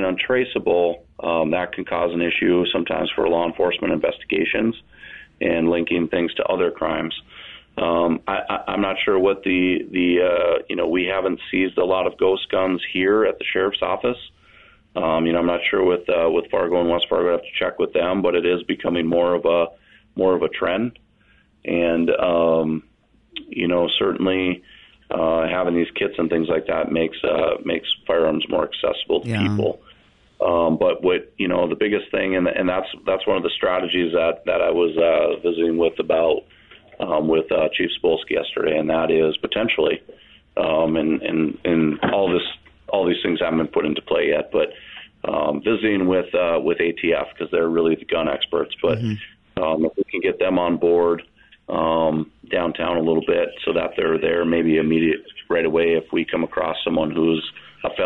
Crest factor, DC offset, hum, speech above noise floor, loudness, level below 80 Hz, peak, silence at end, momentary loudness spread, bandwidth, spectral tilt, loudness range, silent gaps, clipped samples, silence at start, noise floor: 14 dB; 0.1%; none; 37 dB; -21 LUFS; -54 dBFS; -8 dBFS; 0 s; 7 LU; 5.4 kHz; -7.5 dB/octave; 2 LU; none; under 0.1%; 0 s; -57 dBFS